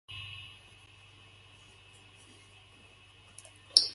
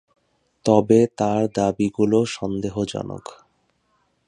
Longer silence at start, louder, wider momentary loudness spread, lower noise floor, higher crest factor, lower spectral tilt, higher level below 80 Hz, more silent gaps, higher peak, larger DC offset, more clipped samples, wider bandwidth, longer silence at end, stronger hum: second, 0.1 s vs 0.65 s; second, -30 LUFS vs -21 LUFS; first, 17 LU vs 14 LU; second, -58 dBFS vs -67 dBFS; first, 38 dB vs 20 dB; second, 0.5 dB/octave vs -6.5 dB/octave; second, -68 dBFS vs -54 dBFS; neither; about the same, 0 dBFS vs -2 dBFS; neither; neither; about the same, 11.5 kHz vs 11 kHz; second, 0 s vs 1.05 s; neither